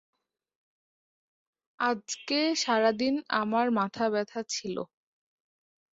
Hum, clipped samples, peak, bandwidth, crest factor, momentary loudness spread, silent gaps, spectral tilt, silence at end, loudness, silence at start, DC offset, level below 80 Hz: none; under 0.1%; -12 dBFS; 8 kHz; 20 dB; 9 LU; none; -3 dB/octave; 1.1 s; -29 LUFS; 1.8 s; under 0.1%; -74 dBFS